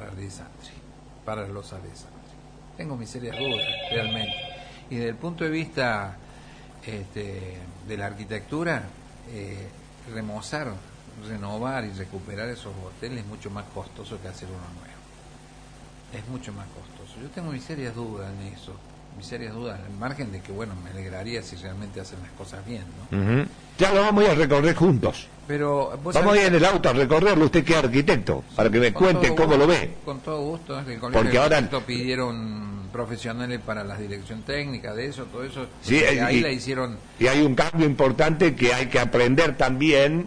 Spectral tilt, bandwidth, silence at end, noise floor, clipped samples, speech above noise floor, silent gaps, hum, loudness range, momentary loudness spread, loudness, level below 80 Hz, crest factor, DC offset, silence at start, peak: -5.5 dB/octave; 10.5 kHz; 0 s; -47 dBFS; under 0.1%; 23 dB; none; none; 17 LU; 21 LU; -23 LUFS; -44 dBFS; 18 dB; under 0.1%; 0 s; -8 dBFS